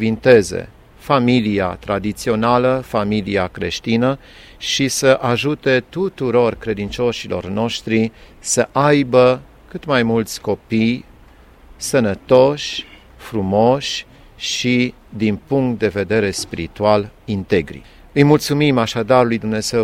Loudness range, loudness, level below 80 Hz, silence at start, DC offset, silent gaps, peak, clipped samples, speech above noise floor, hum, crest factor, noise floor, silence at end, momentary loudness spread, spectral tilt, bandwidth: 2 LU; -17 LUFS; -44 dBFS; 0 s; under 0.1%; none; 0 dBFS; under 0.1%; 28 dB; none; 18 dB; -45 dBFS; 0 s; 11 LU; -5 dB/octave; 16 kHz